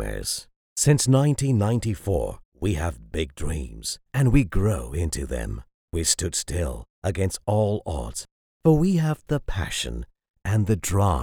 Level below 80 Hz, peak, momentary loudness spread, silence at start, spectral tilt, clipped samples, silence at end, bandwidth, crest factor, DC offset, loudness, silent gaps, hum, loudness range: -34 dBFS; -4 dBFS; 12 LU; 0 s; -5.5 dB/octave; under 0.1%; 0 s; 19 kHz; 20 dB; under 0.1%; -25 LUFS; 0.56-0.76 s, 2.45-2.52 s, 5.74-5.88 s, 6.90-7.02 s, 8.31-8.60 s, 10.30-10.34 s; none; 3 LU